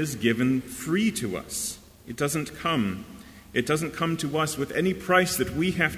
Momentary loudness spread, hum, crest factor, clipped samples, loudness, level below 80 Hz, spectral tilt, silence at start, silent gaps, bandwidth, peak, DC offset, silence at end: 10 LU; none; 20 dB; under 0.1%; -26 LUFS; -52 dBFS; -4.5 dB/octave; 0 s; none; 16 kHz; -6 dBFS; under 0.1%; 0 s